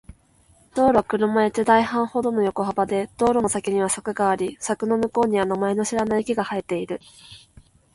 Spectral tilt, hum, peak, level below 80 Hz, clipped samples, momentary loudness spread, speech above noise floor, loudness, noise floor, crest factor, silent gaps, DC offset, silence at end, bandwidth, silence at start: -5 dB/octave; none; -4 dBFS; -54 dBFS; under 0.1%; 8 LU; 36 dB; -22 LUFS; -57 dBFS; 18 dB; none; under 0.1%; 0.55 s; 11.5 kHz; 0.1 s